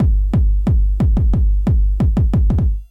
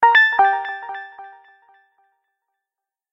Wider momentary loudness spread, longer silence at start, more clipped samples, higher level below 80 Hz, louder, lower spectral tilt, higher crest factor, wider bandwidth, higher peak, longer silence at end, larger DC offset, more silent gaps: second, 2 LU vs 21 LU; about the same, 0 s vs 0 s; neither; first, -14 dBFS vs -70 dBFS; about the same, -17 LUFS vs -16 LUFS; first, -10.5 dB/octave vs -1 dB/octave; second, 6 dB vs 18 dB; second, 3.3 kHz vs 7.4 kHz; second, -6 dBFS vs -2 dBFS; second, 0.05 s vs 1.85 s; neither; neither